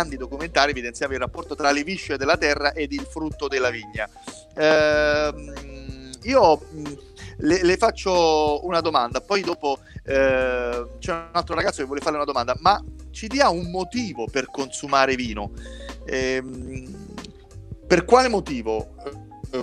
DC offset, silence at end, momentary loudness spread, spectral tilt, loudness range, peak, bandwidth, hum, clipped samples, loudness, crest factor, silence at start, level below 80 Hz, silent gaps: under 0.1%; 0 s; 19 LU; -4 dB/octave; 4 LU; -2 dBFS; 12 kHz; none; under 0.1%; -22 LUFS; 22 dB; 0 s; -42 dBFS; none